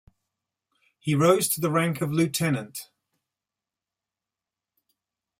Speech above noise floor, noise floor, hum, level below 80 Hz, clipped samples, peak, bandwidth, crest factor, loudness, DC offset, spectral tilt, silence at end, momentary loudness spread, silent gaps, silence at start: 65 dB; -89 dBFS; none; -66 dBFS; under 0.1%; -6 dBFS; 16 kHz; 22 dB; -24 LUFS; under 0.1%; -5 dB/octave; 2.55 s; 14 LU; none; 1.05 s